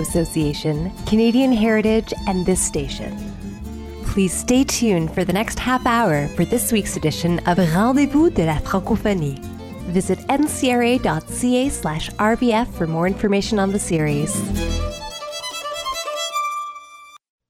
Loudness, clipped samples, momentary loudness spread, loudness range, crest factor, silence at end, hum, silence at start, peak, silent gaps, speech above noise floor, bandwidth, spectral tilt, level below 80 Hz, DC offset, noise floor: -20 LUFS; under 0.1%; 12 LU; 3 LU; 14 dB; 0.3 s; none; 0 s; -4 dBFS; none; 24 dB; 16 kHz; -5 dB/octave; -34 dBFS; under 0.1%; -43 dBFS